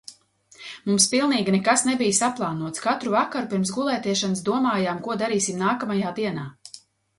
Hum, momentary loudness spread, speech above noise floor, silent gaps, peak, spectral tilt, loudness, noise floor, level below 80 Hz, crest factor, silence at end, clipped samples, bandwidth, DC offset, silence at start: none; 12 LU; 31 dB; none; -4 dBFS; -3.5 dB/octave; -23 LUFS; -54 dBFS; -66 dBFS; 20 dB; 0.4 s; under 0.1%; 11.5 kHz; under 0.1%; 0.1 s